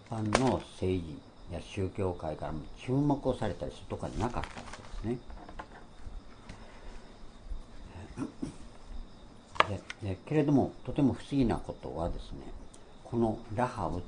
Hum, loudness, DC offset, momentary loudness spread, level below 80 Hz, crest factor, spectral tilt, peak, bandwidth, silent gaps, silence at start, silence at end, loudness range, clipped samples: none; -33 LUFS; under 0.1%; 22 LU; -46 dBFS; 30 dB; -6.5 dB/octave; -4 dBFS; 10.5 kHz; none; 0 s; 0 s; 15 LU; under 0.1%